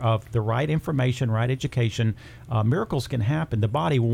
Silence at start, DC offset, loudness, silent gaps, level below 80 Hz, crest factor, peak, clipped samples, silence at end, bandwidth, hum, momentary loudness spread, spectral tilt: 0 s; under 0.1%; -25 LUFS; none; -48 dBFS; 12 dB; -12 dBFS; under 0.1%; 0 s; 13 kHz; none; 4 LU; -7 dB/octave